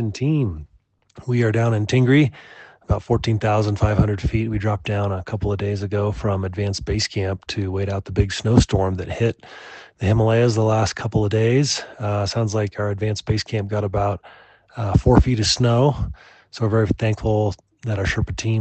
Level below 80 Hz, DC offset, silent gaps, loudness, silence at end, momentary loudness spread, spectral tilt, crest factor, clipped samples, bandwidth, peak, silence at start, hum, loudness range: -34 dBFS; under 0.1%; none; -21 LUFS; 0 s; 9 LU; -6 dB/octave; 20 dB; under 0.1%; 8.6 kHz; 0 dBFS; 0 s; none; 4 LU